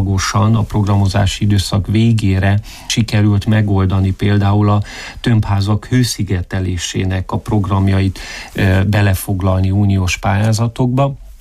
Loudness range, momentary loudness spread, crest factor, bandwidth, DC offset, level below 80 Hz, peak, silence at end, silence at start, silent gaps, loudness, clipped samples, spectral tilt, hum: 2 LU; 6 LU; 10 dB; 14.5 kHz; under 0.1%; -32 dBFS; -4 dBFS; 0.05 s; 0 s; none; -15 LUFS; under 0.1%; -6 dB/octave; none